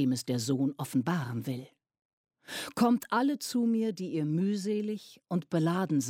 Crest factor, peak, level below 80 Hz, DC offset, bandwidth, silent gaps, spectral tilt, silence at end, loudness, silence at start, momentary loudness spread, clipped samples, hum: 18 dB; -14 dBFS; -74 dBFS; under 0.1%; 16.5 kHz; 2.05-2.24 s; -6 dB/octave; 0 s; -31 LUFS; 0 s; 10 LU; under 0.1%; none